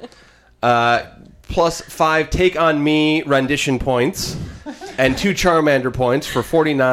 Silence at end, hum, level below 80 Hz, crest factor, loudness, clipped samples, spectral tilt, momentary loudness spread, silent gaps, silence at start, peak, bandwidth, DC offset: 0 s; none; -36 dBFS; 14 dB; -17 LUFS; under 0.1%; -5 dB/octave; 9 LU; none; 0 s; -4 dBFS; 16 kHz; under 0.1%